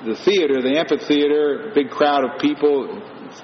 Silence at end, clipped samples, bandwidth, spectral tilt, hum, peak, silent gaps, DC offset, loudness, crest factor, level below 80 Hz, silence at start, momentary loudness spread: 0 s; under 0.1%; 6.6 kHz; -2.5 dB/octave; none; -4 dBFS; none; under 0.1%; -18 LUFS; 14 dB; -66 dBFS; 0 s; 6 LU